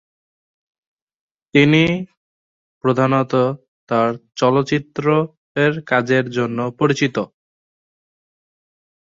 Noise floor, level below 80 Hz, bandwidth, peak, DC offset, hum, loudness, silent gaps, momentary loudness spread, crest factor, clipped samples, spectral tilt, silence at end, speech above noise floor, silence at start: under -90 dBFS; -56 dBFS; 7.8 kHz; -2 dBFS; under 0.1%; none; -18 LUFS; 2.17-2.81 s, 3.68-3.87 s, 5.37-5.55 s; 9 LU; 18 dB; under 0.1%; -6.5 dB/octave; 1.85 s; over 73 dB; 1.55 s